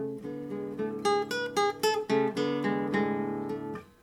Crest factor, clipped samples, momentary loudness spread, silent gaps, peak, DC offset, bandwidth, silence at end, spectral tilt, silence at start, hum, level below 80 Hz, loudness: 16 dB; under 0.1%; 10 LU; none; -14 dBFS; under 0.1%; 15.5 kHz; 0.15 s; -5 dB/octave; 0 s; none; -66 dBFS; -30 LUFS